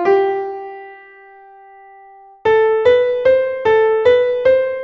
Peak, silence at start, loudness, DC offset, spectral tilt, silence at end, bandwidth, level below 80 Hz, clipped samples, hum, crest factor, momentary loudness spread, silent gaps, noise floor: -2 dBFS; 0 s; -14 LUFS; under 0.1%; -6 dB/octave; 0 s; 6.2 kHz; -52 dBFS; under 0.1%; none; 14 dB; 13 LU; none; -42 dBFS